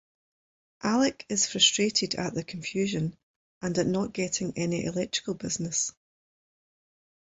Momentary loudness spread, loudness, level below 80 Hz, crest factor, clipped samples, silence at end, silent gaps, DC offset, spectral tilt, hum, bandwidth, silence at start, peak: 12 LU; -28 LUFS; -62 dBFS; 22 dB; under 0.1%; 1.45 s; 3.23-3.61 s; under 0.1%; -3 dB/octave; none; 8.4 kHz; 0.8 s; -8 dBFS